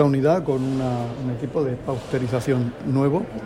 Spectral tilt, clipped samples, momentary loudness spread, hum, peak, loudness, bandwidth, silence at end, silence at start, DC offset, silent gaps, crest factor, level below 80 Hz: -8 dB/octave; under 0.1%; 7 LU; none; -4 dBFS; -23 LUFS; 13.5 kHz; 0 s; 0 s; under 0.1%; none; 18 dB; -48 dBFS